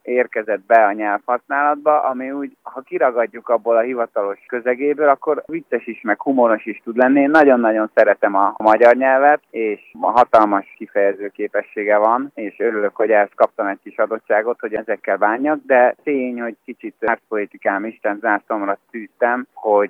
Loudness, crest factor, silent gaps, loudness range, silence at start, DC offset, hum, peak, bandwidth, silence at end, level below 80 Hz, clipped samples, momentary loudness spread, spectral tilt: -17 LUFS; 16 dB; none; 5 LU; 0.05 s; under 0.1%; none; 0 dBFS; 6.4 kHz; 0 s; -68 dBFS; under 0.1%; 11 LU; -7 dB/octave